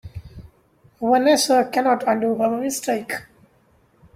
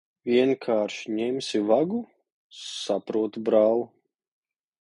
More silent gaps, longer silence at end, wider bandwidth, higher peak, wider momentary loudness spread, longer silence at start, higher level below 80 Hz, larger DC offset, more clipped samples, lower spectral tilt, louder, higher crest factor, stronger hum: second, none vs 2.32-2.50 s; about the same, 0.95 s vs 0.95 s; first, 16.5 kHz vs 11 kHz; first, -4 dBFS vs -8 dBFS; about the same, 15 LU vs 13 LU; second, 0.05 s vs 0.25 s; first, -52 dBFS vs -74 dBFS; neither; neither; second, -3.5 dB/octave vs -5 dB/octave; first, -20 LUFS vs -25 LUFS; about the same, 18 dB vs 18 dB; neither